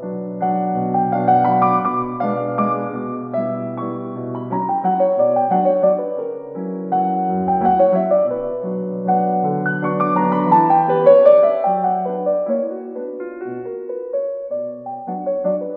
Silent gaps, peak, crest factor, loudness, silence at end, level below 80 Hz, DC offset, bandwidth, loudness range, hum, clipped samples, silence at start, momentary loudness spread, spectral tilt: none; 0 dBFS; 18 dB; -18 LUFS; 0 s; -58 dBFS; under 0.1%; 4.2 kHz; 7 LU; none; under 0.1%; 0 s; 14 LU; -11 dB/octave